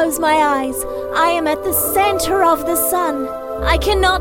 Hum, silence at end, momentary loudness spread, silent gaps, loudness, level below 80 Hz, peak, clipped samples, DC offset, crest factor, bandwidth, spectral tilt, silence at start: none; 0 s; 7 LU; none; -16 LUFS; -30 dBFS; -2 dBFS; under 0.1%; under 0.1%; 14 dB; 17 kHz; -3.5 dB/octave; 0 s